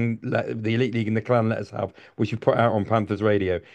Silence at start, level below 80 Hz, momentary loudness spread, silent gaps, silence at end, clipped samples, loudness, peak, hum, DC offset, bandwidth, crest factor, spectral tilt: 0 s; -58 dBFS; 8 LU; none; 0.15 s; under 0.1%; -24 LUFS; -4 dBFS; none; under 0.1%; 8.4 kHz; 18 dB; -8.5 dB/octave